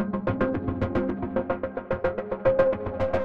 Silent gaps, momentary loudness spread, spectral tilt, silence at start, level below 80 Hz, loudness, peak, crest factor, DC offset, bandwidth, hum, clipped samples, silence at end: none; 7 LU; -9.5 dB/octave; 0 s; -44 dBFS; -27 LUFS; -8 dBFS; 18 dB; 0.4%; 5.6 kHz; none; under 0.1%; 0 s